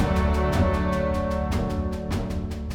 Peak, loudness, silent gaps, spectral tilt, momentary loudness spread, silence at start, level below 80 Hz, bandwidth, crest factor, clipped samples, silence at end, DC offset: -8 dBFS; -25 LUFS; none; -7 dB/octave; 6 LU; 0 s; -30 dBFS; 15 kHz; 16 dB; under 0.1%; 0 s; under 0.1%